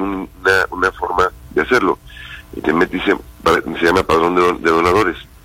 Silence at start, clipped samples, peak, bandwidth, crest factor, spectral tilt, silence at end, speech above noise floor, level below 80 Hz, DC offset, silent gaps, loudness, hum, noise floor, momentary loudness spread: 0 s; under 0.1%; 0 dBFS; 16.5 kHz; 16 dB; -5 dB/octave; 0.2 s; 20 dB; -38 dBFS; under 0.1%; none; -16 LUFS; none; -35 dBFS; 9 LU